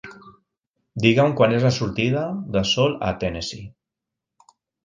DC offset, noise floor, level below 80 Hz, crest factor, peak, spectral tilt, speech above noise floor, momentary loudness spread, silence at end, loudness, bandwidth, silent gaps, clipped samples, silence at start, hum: under 0.1%; -85 dBFS; -48 dBFS; 22 dB; 0 dBFS; -5.5 dB/octave; 65 dB; 14 LU; 1.15 s; -21 LUFS; 9.4 kHz; 0.67-0.74 s; under 0.1%; 0.05 s; none